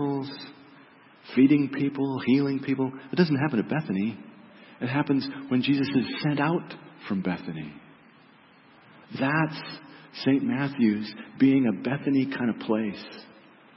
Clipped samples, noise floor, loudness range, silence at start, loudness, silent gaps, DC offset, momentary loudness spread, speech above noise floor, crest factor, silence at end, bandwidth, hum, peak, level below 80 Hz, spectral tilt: under 0.1%; -55 dBFS; 7 LU; 0 s; -26 LUFS; none; under 0.1%; 18 LU; 30 dB; 18 dB; 0.5 s; 5.8 kHz; none; -8 dBFS; -70 dBFS; -11 dB/octave